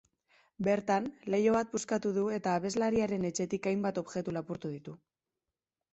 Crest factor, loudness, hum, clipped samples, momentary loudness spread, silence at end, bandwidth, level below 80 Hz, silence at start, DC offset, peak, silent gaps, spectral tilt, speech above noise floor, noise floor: 18 dB; -32 LUFS; none; under 0.1%; 10 LU; 0.95 s; 8.2 kHz; -68 dBFS; 0.6 s; under 0.1%; -16 dBFS; none; -5.5 dB/octave; over 58 dB; under -90 dBFS